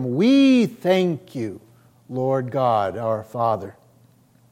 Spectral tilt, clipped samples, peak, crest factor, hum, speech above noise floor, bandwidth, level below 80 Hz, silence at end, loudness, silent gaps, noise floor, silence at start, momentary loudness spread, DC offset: -7 dB/octave; under 0.1%; -6 dBFS; 14 dB; none; 35 dB; 14 kHz; -70 dBFS; 0.8 s; -20 LUFS; none; -55 dBFS; 0 s; 15 LU; under 0.1%